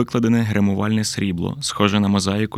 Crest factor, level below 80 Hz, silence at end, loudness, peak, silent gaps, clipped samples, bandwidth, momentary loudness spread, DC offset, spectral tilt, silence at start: 18 dB; -52 dBFS; 0 s; -19 LUFS; 0 dBFS; none; under 0.1%; 14.5 kHz; 5 LU; under 0.1%; -5.5 dB/octave; 0 s